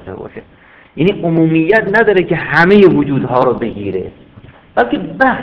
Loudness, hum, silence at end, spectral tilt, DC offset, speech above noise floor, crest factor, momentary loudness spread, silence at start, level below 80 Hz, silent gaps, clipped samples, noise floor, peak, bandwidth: -12 LUFS; none; 0 s; -9 dB/octave; under 0.1%; 28 dB; 12 dB; 18 LU; 0.05 s; -42 dBFS; none; 0.6%; -39 dBFS; 0 dBFS; 5.4 kHz